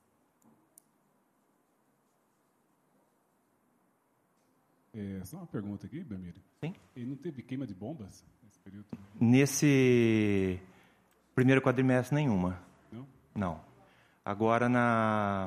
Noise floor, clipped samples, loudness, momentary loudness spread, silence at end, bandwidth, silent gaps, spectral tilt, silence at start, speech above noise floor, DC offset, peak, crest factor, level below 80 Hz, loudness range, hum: -73 dBFS; under 0.1%; -29 LUFS; 23 LU; 0 s; 15 kHz; none; -6.5 dB/octave; 4.95 s; 43 dB; under 0.1%; -12 dBFS; 20 dB; -66 dBFS; 17 LU; none